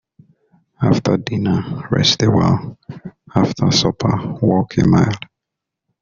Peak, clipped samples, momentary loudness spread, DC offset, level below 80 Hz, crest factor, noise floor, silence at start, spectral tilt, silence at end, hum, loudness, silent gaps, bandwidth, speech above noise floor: 0 dBFS; under 0.1%; 16 LU; under 0.1%; -44 dBFS; 16 dB; -82 dBFS; 0.8 s; -5.5 dB/octave; 0.85 s; none; -16 LUFS; none; 7.4 kHz; 66 dB